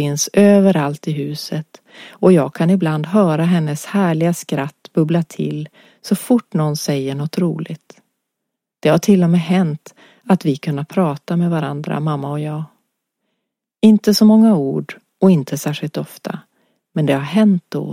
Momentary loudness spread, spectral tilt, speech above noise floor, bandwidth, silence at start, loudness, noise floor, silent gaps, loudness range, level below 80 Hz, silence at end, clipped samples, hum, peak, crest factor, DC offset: 15 LU; -6.5 dB/octave; 63 dB; 16 kHz; 0 s; -16 LUFS; -79 dBFS; none; 5 LU; -62 dBFS; 0 s; under 0.1%; none; 0 dBFS; 16 dB; under 0.1%